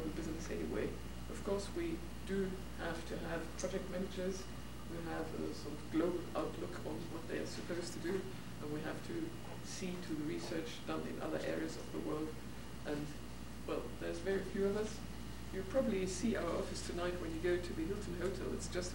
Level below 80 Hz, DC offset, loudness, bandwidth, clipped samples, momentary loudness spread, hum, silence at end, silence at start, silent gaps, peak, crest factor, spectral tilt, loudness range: -54 dBFS; 0.3%; -42 LUFS; 19 kHz; under 0.1%; 9 LU; none; 0 s; 0 s; none; -24 dBFS; 18 dB; -5.5 dB/octave; 4 LU